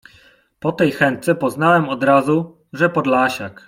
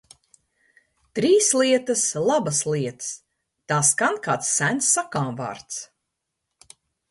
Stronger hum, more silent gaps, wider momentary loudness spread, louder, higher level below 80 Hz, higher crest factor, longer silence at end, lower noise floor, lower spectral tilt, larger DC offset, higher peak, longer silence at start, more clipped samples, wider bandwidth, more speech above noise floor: neither; neither; second, 6 LU vs 15 LU; first, -17 LUFS vs -21 LUFS; first, -58 dBFS vs -66 dBFS; about the same, 16 dB vs 20 dB; second, 0.15 s vs 1.25 s; second, -52 dBFS vs -80 dBFS; first, -6.5 dB/octave vs -3 dB/octave; neither; about the same, -2 dBFS vs -4 dBFS; second, 0.65 s vs 1.15 s; neither; first, 16.5 kHz vs 12 kHz; second, 35 dB vs 58 dB